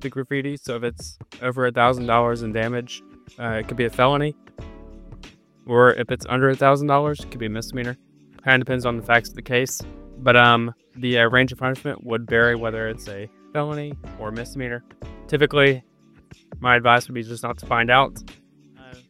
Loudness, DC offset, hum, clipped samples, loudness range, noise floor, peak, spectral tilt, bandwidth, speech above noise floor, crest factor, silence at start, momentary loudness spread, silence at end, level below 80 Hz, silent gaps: -21 LUFS; under 0.1%; none; under 0.1%; 6 LU; -50 dBFS; 0 dBFS; -5 dB/octave; 15.5 kHz; 29 dB; 22 dB; 0 s; 17 LU; 0.15 s; -46 dBFS; none